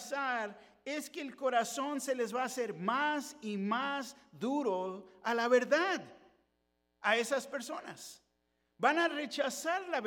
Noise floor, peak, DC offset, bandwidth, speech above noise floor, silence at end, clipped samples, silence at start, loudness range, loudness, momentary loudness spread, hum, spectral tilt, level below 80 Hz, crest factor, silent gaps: -80 dBFS; -14 dBFS; under 0.1%; 17.5 kHz; 45 dB; 0 s; under 0.1%; 0 s; 2 LU; -34 LUFS; 13 LU; none; -3.5 dB/octave; -84 dBFS; 22 dB; none